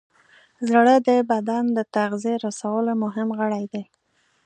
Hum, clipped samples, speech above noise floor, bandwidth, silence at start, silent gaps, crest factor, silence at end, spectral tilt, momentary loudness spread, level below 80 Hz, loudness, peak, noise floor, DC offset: none; under 0.1%; 35 dB; 9.4 kHz; 0.6 s; none; 20 dB; 0.65 s; -5.5 dB/octave; 12 LU; -76 dBFS; -22 LUFS; -2 dBFS; -56 dBFS; under 0.1%